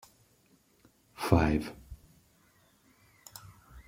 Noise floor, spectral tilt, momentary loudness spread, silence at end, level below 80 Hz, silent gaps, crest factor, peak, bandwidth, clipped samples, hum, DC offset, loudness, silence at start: -67 dBFS; -7 dB/octave; 28 LU; 0.05 s; -48 dBFS; none; 28 dB; -8 dBFS; 16.5 kHz; under 0.1%; none; under 0.1%; -30 LUFS; 1.2 s